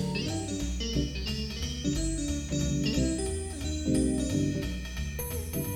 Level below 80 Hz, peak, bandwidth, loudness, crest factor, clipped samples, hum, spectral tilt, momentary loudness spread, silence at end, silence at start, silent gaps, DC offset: -36 dBFS; -16 dBFS; 17 kHz; -31 LUFS; 14 dB; under 0.1%; none; -5 dB/octave; 6 LU; 0 s; 0 s; none; under 0.1%